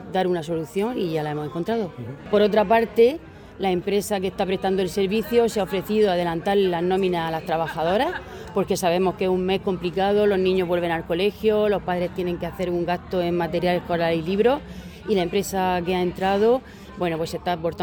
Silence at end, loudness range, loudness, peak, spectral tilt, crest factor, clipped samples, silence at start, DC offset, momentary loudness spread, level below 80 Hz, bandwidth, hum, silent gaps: 0 s; 2 LU; -23 LUFS; -6 dBFS; -6 dB/octave; 16 dB; under 0.1%; 0 s; under 0.1%; 8 LU; -48 dBFS; 19 kHz; none; none